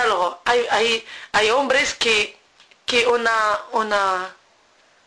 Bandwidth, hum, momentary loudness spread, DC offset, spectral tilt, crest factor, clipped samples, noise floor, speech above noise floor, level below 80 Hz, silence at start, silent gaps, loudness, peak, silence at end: 11 kHz; none; 7 LU; under 0.1%; -1 dB/octave; 14 dB; under 0.1%; -57 dBFS; 37 dB; -56 dBFS; 0 s; none; -19 LUFS; -8 dBFS; 0.75 s